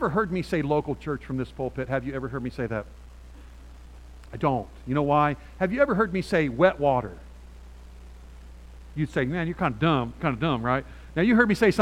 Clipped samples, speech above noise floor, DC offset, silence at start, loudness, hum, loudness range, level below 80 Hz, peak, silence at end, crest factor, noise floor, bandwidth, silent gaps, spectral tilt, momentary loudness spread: under 0.1%; 20 dB; under 0.1%; 0 s; -26 LUFS; none; 8 LU; -44 dBFS; -6 dBFS; 0 s; 20 dB; -45 dBFS; 15 kHz; none; -7.5 dB/octave; 11 LU